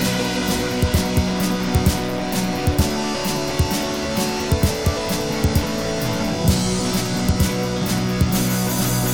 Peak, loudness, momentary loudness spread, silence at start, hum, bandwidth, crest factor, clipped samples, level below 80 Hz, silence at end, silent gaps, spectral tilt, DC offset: -4 dBFS; -20 LUFS; 3 LU; 0 s; none; 17.5 kHz; 16 dB; under 0.1%; -30 dBFS; 0 s; none; -5 dB/octave; 0.7%